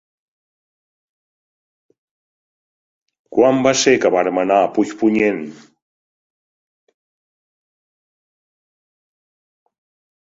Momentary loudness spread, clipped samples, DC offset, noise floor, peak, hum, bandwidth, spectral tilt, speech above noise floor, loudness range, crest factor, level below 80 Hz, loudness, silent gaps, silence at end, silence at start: 8 LU; under 0.1%; under 0.1%; under -90 dBFS; 0 dBFS; none; 8 kHz; -4 dB/octave; over 75 dB; 8 LU; 22 dB; -62 dBFS; -16 LUFS; none; 4.8 s; 3.3 s